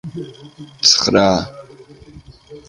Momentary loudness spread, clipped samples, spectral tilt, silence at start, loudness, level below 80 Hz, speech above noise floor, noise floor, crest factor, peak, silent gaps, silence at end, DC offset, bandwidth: 21 LU; under 0.1%; -3 dB/octave; 0.05 s; -13 LUFS; -46 dBFS; 25 dB; -41 dBFS; 20 dB; 0 dBFS; none; 0.1 s; under 0.1%; 11.5 kHz